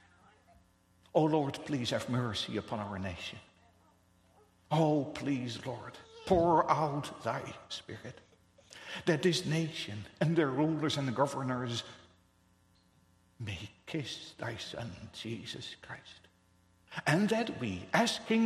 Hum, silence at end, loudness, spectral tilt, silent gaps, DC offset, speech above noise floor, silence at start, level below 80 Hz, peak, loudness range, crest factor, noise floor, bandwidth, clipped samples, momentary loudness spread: none; 0 s; -34 LUFS; -5.5 dB/octave; none; under 0.1%; 35 dB; 1.15 s; -64 dBFS; -12 dBFS; 10 LU; 24 dB; -68 dBFS; 13.5 kHz; under 0.1%; 16 LU